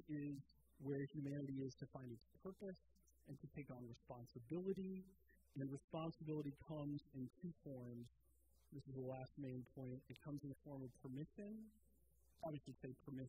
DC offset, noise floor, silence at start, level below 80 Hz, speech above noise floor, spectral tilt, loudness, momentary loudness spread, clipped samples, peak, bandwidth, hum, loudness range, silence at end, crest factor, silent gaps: under 0.1%; -77 dBFS; 0 s; -78 dBFS; 25 dB; -8.5 dB/octave; -53 LUFS; 10 LU; under 0.1%; -34 dBFS; 15.5 kHz; none; 4 LU; 0 s; 18 dB; 5.84-5.88 s